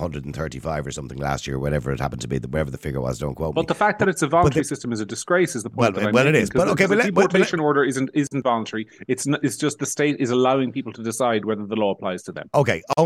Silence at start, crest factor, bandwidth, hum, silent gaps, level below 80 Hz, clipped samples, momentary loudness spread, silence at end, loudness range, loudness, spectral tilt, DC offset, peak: 0 s; 18 dB; 16 kHz; none; none; -44 dBFS; under 0.1%; 10 LU; 0 s; 6 LU; -22 LUFS; -5.5 dB/octave; under 0.1%; -4 dBFS